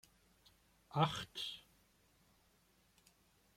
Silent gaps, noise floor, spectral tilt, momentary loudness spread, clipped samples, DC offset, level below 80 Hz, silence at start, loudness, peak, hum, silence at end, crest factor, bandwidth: none; -74 dBFS; -5 dB/octave; 10 LU; under 0.1%; under 0.1%; -74 dBFS; 0.9 s; -40 LUFS; -20 dBFS; none; 1.95 s; 26 dB; 16 kHz